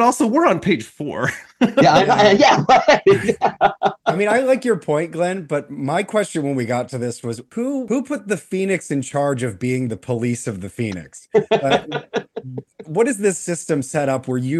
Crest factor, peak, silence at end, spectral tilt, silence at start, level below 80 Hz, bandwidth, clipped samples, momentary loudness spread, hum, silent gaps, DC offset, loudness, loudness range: 14 dB; -4 dBFS; 0 s; -5 dB/octave; 0 s; -56 dBFS; 12.5 kHz; under 0.1%; 13 LU; none; none; under 0.1%; -19 LUFS; 8 LU